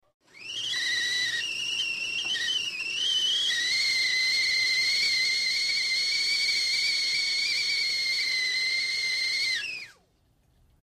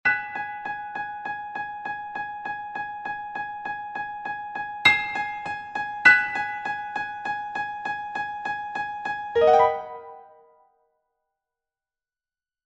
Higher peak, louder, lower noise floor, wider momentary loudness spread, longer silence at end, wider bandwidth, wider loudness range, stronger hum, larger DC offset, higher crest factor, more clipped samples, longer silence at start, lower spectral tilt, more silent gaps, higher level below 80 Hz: second, -16 dBFS vs -2 dBFS; about the same, -24 LUFS vs -25 LUFS; second, -66 dBFS vs under -90 dBFS; second, 6 LU vs 15 LU; second, 0.9 s vs 2.35 s; first, 15.5 kHz vs 12 kHz; second, 3 LU vs 10 LU; neither; neither; second, 12 dB vs 26 dB; neither; first, 0.35 s vs 0.05 s; second, 2.5 dB/octave vs -3 dB/octave; neither; second, -68 dBFS vs -62 dBFS